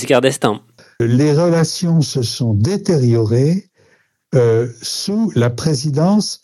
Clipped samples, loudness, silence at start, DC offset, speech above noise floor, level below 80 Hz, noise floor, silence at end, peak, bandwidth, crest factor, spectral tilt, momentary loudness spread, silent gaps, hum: under 0.1%; -16 LUFS; 0 s; under 0.1%; 42 dB; -52 dBFS; -56 dBFS; 0.1 s; 0 dBFS; 13 kHz; 16 dB; -6 dB/octave; 6 LU; none; none